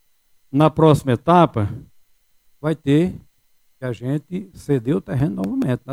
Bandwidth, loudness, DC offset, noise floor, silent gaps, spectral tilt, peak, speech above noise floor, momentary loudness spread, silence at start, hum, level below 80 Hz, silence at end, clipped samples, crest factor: 15 kHz; -19 LUFS; under 0.1%; -59 dBFS; none; -8 dB/octave; -2 dBFS; 40 dB; 15 LU; 0.55 s; none; -48 dBFS; 0 s; under 0.1%; 18 dB